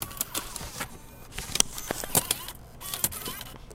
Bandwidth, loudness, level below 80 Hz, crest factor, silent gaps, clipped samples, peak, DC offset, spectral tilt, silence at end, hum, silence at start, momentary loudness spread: 17 kHz; -29 LUFS; -48 dBFS; 32 dB; none; under 0.1%; 0 dBFS; under 0.1%; -1.5 dB/octave; 0 s; none; 0 s; 15 LU